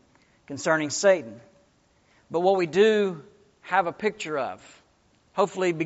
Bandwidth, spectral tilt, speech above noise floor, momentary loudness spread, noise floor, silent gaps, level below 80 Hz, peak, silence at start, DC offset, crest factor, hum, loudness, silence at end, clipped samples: 8 kHz; -3.5 dB/octave; 39 dB; 15 LU; -63 dBFS; none; -70 dBFS; -8 dBFS; 0.5 s; under 0.1%; 18 dB; none; -25 LUFS; 0 s; under 0.1%